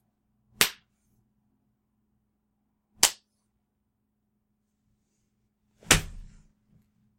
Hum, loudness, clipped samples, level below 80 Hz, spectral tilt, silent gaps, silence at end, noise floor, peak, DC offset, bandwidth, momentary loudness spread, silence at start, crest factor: none; -24 LUFS; under 0.1%; -48 dBFS; -1 dB/octave; none; 0.95 s; -78 dBFS; 0 dBFS; under 0.1%; 16.5 kHz; 2 LU; 0.6 s; 34 dB